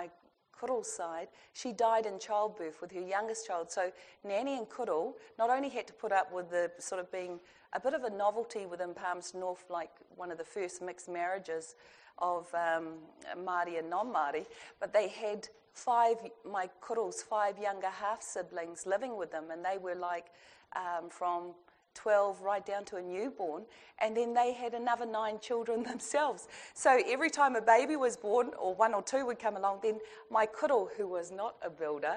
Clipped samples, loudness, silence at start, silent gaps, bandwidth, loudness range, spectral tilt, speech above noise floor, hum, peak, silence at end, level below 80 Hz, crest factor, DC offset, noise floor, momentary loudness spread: under 0.1%; -35 LUFS; 0 s; none; 10 kHz; 8 LU; -3 dB/octave; 30 dB; none; -12 dBFS; 0 s; -80 dBFS; 22 dB; under 0.1%; -64 dBFS; 13 LU